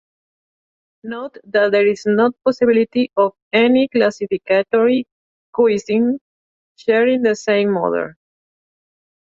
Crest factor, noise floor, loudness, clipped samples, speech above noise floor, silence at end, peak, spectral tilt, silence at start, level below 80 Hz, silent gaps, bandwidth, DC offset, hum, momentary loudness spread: 16 dB; under -90 dBFS; -17 LUFS; under 0.1%; over 74 dB; 1.25 s; -2 dBFS; -5.5 dB/octave; 1.05 s; -64 dBFS; 3.42-3.51 s, 5.12-5.53 s, 6.21-6.75 s; 7.8 kHz; under 0.1%; none; 13 LU